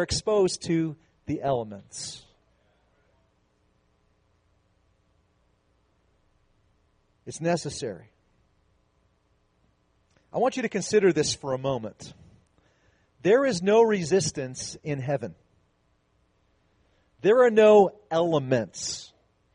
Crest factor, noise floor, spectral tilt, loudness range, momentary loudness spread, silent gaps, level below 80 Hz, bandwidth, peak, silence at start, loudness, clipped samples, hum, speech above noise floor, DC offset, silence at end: 20 dB; -68 dBFS; -5 dB/octave; 13 LU; 18 LU; none; -60 dBFS; 10 kHz; -8 dBFS; 0 s; -25 LUFS; under 0.1%; none; 44 dB; under 0.1%; 0.5 s